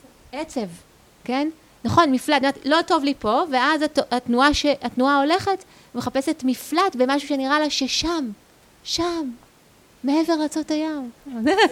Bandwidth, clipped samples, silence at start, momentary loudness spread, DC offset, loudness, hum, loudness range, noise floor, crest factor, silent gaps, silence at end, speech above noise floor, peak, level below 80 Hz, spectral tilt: 16 kHz; under 0.1%; 0.35 s; 13 LU; under 0.1%; -21 LUFS; none; 5 LU; -54 dBFS; 20 dB; none; 0 s; 32 dB; -2 dBFS; -48 dBFS; -3.5 dB/octave